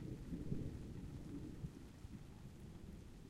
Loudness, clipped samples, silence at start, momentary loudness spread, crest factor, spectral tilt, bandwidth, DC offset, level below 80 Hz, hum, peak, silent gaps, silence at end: -52 LUFS; under 0.1%; 0 s; 10 LU; 20 dB; -7.5 dB/octave; 15.5 kHz; under 0.1%; -58 dBFS; none; -30 dBFS; none; 0 s